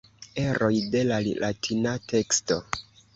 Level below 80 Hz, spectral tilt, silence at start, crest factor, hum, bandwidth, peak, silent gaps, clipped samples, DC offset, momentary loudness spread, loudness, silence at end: -54 dBFS; -4 dB/octave; 0.2 s; 20 dB; none; 8 kHz; -6 dBFS; none; under 0.1%; under 0.1%; 8 LU; -26 LUFS; 0.35 s